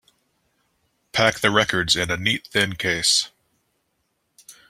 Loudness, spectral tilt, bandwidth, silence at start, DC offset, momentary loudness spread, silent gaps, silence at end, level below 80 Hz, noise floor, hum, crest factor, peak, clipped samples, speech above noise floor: -20 LUFS; -2.5 dB/octave; 16 kHz; 1.15 s; under 0.1%; 5 LU; none; 0.15 s; -54 dBFS; -72 dBFS; none; 24 dB; -2 dBFS; under 0.1%; 51 dB